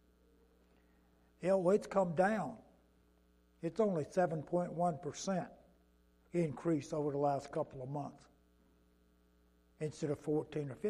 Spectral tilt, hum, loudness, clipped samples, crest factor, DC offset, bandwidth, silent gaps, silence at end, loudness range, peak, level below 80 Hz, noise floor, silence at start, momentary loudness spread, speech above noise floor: -7 dB/octave; none; -37 LUFS; under 0.1%; 20 dB; under 0.1%; 12 kHz; none; 0 s; 6 LU; -18 dBFS; -70 dBFS; -70 dBFS; 1.4 s; 12 LU; 34 dB